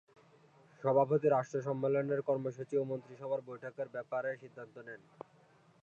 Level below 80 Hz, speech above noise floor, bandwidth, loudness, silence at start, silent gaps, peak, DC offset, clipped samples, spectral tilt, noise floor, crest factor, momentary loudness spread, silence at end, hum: -88 dBFS; 31 dB; 7.6 kHz; -35 LUFS; 0.8 s; none; -16 dBFS; under 0.1%; under 0.1%; -8.5 dB/octave; -65 dBFS; 20 dB; 21 LU; 0.85 s; none